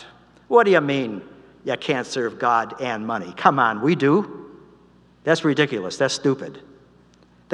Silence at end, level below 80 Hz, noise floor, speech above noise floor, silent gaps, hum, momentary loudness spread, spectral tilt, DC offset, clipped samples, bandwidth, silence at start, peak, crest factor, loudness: 0 s; -66 dBFS; -54 dBFS; 34 dB; none; 60 Hz at -50 dBFS; 13 LU; -5 dB/octave; under 0.1%; under 0.1%; 10.5 kHz; 0 s; 0 dBFS; 22 dB; -21 LUFS